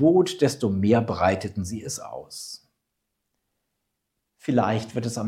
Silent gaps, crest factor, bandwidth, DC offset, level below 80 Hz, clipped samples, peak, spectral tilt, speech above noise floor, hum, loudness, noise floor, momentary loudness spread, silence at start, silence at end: none; 18 dB; 15.5 kHz; under 0.1%; -64 dBFS; under 0.1%; -6 dBFS; -6 dB/octave; 56 dB; none; -24 LUFS; -79 dBFS; 16 LU; 0 s; 0 s